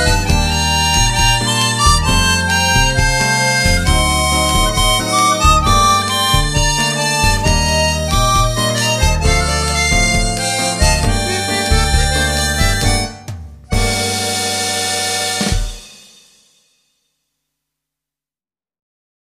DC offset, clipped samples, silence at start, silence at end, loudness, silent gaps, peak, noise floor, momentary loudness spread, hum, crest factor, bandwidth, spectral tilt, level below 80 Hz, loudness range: under 0.1%; under 0.1%; 0 s; 3.25 s; -13 LUFS; none; 0 dBFS; under -90 dBFS; 5 LU; none; 14 dB; 15.5 kHz; -3 dB/octave; -20 dBFS; 6 LU